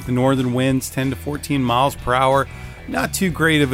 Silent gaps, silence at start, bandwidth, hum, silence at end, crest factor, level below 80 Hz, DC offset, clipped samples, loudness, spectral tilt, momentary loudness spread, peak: none; 0 s; 16 kHz; none; 0 s; 16 dB; -40 dBFS; under 0.1%; under 0.1%; -19 LUFS; -5 dB/octave; 9 LU; -4 dBFS